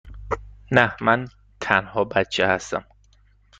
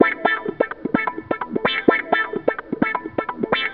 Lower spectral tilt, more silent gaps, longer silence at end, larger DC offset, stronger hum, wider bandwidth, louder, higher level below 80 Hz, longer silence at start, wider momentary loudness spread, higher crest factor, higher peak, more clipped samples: first, -5 dB/octave vs -2.5 dB/octave; neither; first, 0.75 s vs 0 s; second, under 0.1% vs 0.2%; neither; first, 9.4 kHz vs 5.2 kHz; about the same, -22 LUFS vs -22 LUFS; first, -46 dBFS vs -54 dBFS; about the same, 0.05 s vs 0 s; first, 12 LU vs 8 LU; about the same, 22 dB vs 22 dB; about the same, -2 dBFS vs 0 dBFS; neither